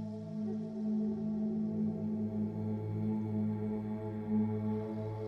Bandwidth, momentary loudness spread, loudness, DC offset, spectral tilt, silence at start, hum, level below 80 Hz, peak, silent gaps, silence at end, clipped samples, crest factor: 5.4 kHz; 5 LU; -36 LUFS; under 0.1%; -11 dB/octave; 0 s; none; -66 dBFS; -24 dBFS; none; 0 s; under 0.1%; 12 dB